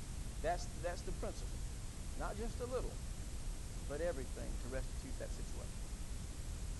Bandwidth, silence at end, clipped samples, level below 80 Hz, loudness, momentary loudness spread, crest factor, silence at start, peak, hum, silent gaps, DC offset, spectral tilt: 12 kHz; 0 s; under 0.1%; -44 dBFS; -45 LUFS; 7 LU; 16 dB; 0 s; -26 dBFS; none; none; under 0.1%; -5 dB/octave